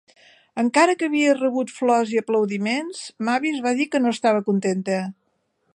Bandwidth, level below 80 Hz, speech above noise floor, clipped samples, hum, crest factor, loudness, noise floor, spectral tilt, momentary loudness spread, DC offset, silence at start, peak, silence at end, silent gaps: 11 kHz; -76 dBFS; 49 dB; under 0.1%; none; 18 dB; -21 LUFS; -70 dBFS; -5 dB/octave; 8 LU; under 0.1%; 0.55 s; -4 dBFS; 0.6 s; none